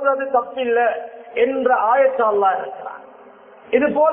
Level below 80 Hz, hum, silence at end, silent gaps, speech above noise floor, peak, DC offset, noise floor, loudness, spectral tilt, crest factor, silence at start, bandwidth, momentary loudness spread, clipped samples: -62 dBFS; none; 0 s; none; 27 dB; -4 dBFS; under 0.1%; -44 dBFS; -18 LUFS; -8.5 dB/octave; 16 dB; 0 s; 3.6 kHz; 14 LU; under 0.1%